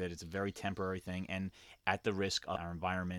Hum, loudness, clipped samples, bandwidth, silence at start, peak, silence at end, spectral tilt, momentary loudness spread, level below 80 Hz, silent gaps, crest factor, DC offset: none; -38 LUFS; under 0.1%; 14.5 kHz; 0 s; -14 dBFS; 0 s; -4.5 dB/octave; 6 LU; -62 dBFS; none; 24 dB; under 0.1%